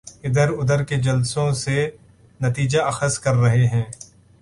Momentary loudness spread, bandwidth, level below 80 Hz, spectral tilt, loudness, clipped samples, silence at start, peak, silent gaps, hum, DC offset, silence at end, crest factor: 8 LU; 11.5 kHz; -48 dBFS; -5.5 dB/octave; -20 LUFS; under 0.1%; 0.05 s; -6 dBFS; none; none; under 0.1%; 0.35 s; 14 dB